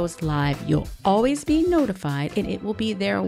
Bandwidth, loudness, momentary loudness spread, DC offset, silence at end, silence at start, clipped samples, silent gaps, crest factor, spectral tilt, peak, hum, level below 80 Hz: 15 kHz; -23 LUFS; 6 LU; under 0.1%; 0 s; 0 s; under 0.1%; none; 16 dB; -6.5 dB/octave; -8 dBFS; none; -42 dBFS